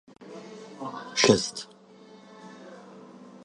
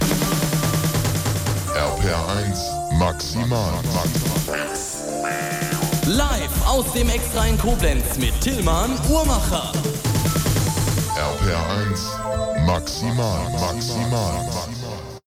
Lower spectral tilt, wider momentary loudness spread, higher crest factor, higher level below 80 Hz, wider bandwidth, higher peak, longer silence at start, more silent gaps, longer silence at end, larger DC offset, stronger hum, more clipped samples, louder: about the same, -3.5 dB/octave vs -4.5 dB/octave; first, 27 LU vs 5 LU; first, 28 dB vs 16 dB; second, -64 dBFS vs -28 dBFS; second, 11.5 kHz vs 17 kHz; first, -2 dBFS vs -6 dBFS; first, 0.2 s vs 0 s; neither; about the same, 0.15 s vs 0.15 s; neither; neither; neither; second, -25 LUFS vs -21 LUFS